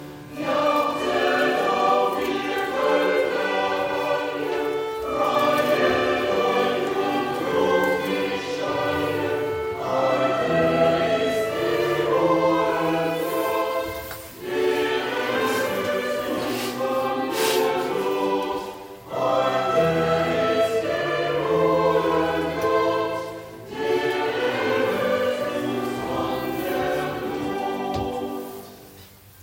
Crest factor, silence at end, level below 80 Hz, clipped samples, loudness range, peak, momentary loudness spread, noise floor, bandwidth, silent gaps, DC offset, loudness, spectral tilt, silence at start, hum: 16 dB; 0 s; -56 dBFS; under 0.1%; 3 LU; -8 dBFS; 7 LU; -47 dBFS; 17 kHz; none; under 0.1%; -23 LUFS; -5 dB/octave; 0 s; none